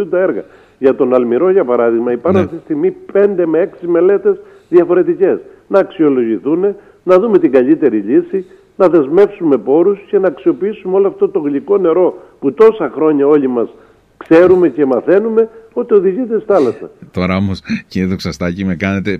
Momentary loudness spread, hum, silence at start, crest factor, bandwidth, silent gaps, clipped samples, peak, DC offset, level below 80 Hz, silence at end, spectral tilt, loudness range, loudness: 9 LU; none; 0 s; 12 dB; 6.6 kHz; none; under 0.1%; 0 dBFS; under 0.1%; -50 dBFS; 0 s; -8 dB/octave; 2 LU; -13 LUFS